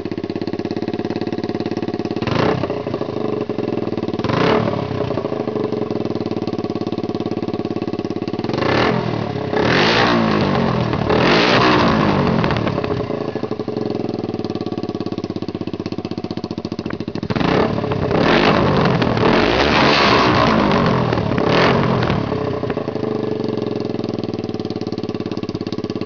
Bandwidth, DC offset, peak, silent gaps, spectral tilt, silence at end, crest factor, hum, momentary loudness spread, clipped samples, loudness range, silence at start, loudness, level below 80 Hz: 5.4 kHz; 0.4%; -2 dBFS; none; -6.5 dB/octave; 0 s; 16 dB; none; 11 LU; under 0.1%; 9 LU; 0 s; -18 LUFS; -40 dBFS